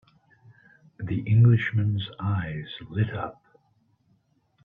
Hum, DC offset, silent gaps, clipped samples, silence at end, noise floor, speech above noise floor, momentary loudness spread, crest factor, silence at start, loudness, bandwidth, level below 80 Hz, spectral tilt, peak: none; under 0.1%; none; under 0.1%; 1.3 s; -67 dBFS; 43 dB; 16 LU; 18 dB; 1 s; -25 LUFS; 4 kHz; -58 dBFS; -9.5 dB/octave; -10 dBFS